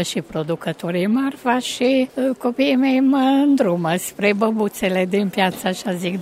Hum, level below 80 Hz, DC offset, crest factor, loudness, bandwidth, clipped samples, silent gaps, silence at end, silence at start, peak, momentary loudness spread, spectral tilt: none; -58 dBFS; under 0.1%; 16 dB; -19 LUFS; 16 kHz; under 0.1%; none; 0 s; 0 s; -2 dBFS; 8 LU; -5 dB/octave